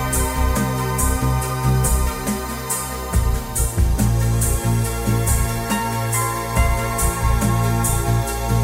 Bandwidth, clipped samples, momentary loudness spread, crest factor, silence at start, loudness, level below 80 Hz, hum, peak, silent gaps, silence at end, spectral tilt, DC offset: 16.5 kHz; under 0.1%; 4 LU; 14 dB; 0 s; -20 LUFS; -24 dBFS; none; -4 dBFS; none; 0 s; -5 dB/octave; under 0.1%